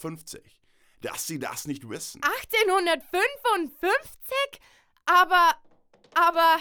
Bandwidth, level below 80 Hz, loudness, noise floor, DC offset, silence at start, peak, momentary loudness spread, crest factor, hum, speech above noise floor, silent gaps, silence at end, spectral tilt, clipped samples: over 20 kHz; -62 dBFS; -24 LUFS; -58 dBFS; under 0.1%; 0 s; -8 dBFS; 16 LU; 16 dB; none; 33 dB; none; 0 s; -2.5 dB/octave; under 0.1%